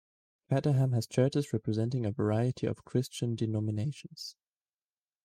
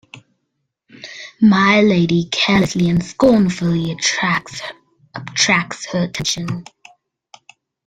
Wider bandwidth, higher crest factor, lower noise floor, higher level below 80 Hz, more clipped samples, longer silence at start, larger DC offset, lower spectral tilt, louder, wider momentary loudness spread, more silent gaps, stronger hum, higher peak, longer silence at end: first, 14.5 kHz vs 10 kHz; about the same, 16 dB vs 18 dB; first, under -90 dBFS vs -73 dBFS; second, -68 dBFS vs -48 dBFS; neither; first, 0.5 s vs 0.15 s; neither; first, -7 dB/octave vs -4.5 dB/octave; second, -31 LUFS vs -16 LUFS; second, 9 LU vs 20 LU; neither; neither; second, -14 dBFS vs 0 dBFS; second, 0.95 s vs 1.25 s